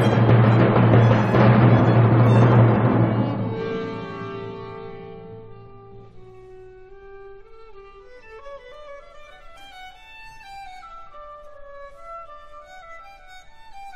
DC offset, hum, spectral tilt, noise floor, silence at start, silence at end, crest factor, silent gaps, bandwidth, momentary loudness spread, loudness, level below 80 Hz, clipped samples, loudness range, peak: under 0.1%; none; -9 dB/octave; -43 dBFS; 0 s; 0 s; 18 dB; none; 6 kHz; 26 LU; -17 LUFS; -46 dBFS; under 0.1%; 27 LU; -2 dBFS